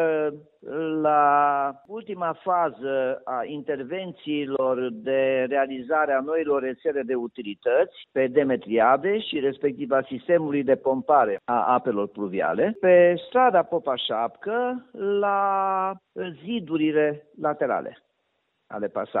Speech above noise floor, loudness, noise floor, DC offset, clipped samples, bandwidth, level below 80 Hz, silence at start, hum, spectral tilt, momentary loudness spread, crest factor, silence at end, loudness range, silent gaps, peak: 50 dB; -24 LUFS; -74 dBFS; under 0.1%; under 0.1%; 4.1 kHz; -70 dBFS; 0 s; none; -9.5 dB/octave; 10 LU; 18 dB; 0 s; 5 LU; none; -6 dBFS